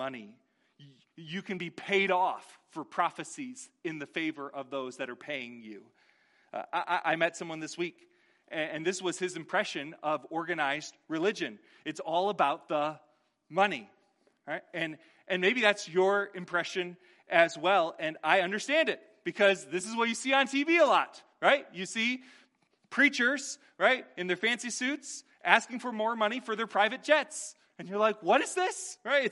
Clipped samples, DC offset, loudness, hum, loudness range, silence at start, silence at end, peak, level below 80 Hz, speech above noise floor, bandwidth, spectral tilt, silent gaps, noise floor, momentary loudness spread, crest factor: under 0.1%; under 0.1%; -30 LUFS; none; 7 LU; 0 s; 0 s; -6 dBFS; -86 dBFS; 40 dB; 11.5 kHz; -3 dB/octave; none; -70 dBFS; 14 LU; 26 dB